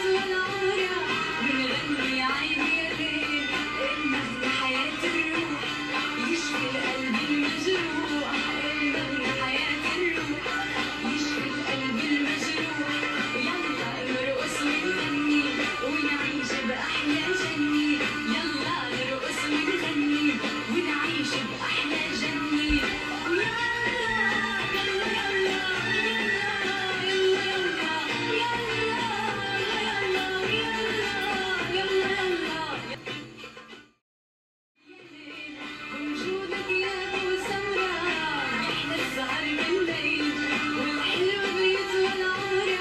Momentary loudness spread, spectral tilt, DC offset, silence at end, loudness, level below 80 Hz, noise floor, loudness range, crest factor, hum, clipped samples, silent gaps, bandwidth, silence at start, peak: 4 LU; -3.5 dB/octave; under 0.1%; 0 s; -26 LUFS; -52 dBFS; -48 dBFS; 4 LU; 16 dB; none; under 0.1%; 34.01-34.75 s; 13.5 kHz; 0 s; -12 dBFS